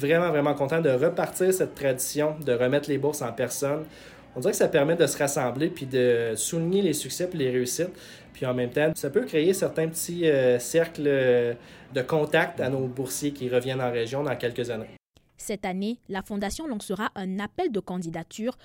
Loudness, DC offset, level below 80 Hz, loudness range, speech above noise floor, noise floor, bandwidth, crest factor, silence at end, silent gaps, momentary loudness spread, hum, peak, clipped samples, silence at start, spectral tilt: -26 LUFS; under 0.1%; -58 dBFS; 7 LU; 20 dB; -46 dBFS; 17 kHz; 18 dB; 0.1 s; none; 10 LU; none; -8 dBFS; under 0.1%; 0 s; -5 dB/octave